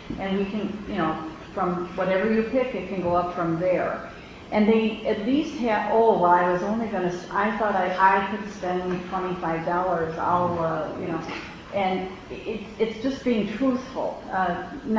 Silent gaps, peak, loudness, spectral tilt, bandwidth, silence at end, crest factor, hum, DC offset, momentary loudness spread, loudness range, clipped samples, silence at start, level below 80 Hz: none; -6 dBFS; -25 LUFS; -7 dB/octave; 7.8 kHz; 0 s; 18 dB; none; under 0.1%; 11 LU; 5 LU; under 0.1%; 0 s; -50 dBFS